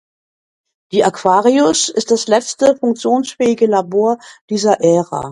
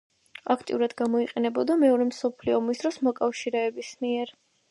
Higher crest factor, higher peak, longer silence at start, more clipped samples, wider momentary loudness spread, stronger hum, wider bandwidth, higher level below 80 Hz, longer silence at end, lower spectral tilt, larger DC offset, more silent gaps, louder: about the same, 14 dB vs 18 dB; first, 0 dBFS vs -10 dBFS; first, 0.9 s vs 0.45 s; neither; second, 5 LU vs 9 LU; neither; about the same, 11.5 kHz vs 11.5 kHz; first, -58 dBFS vs -68 dBFS; second, 0 s vs 0.4 s; about the same, -4 dB/octave vs -4.5 dB/octave; neither; first, 4.41-4.48 s vs none; first, -14 LUFS vs -26 LUFS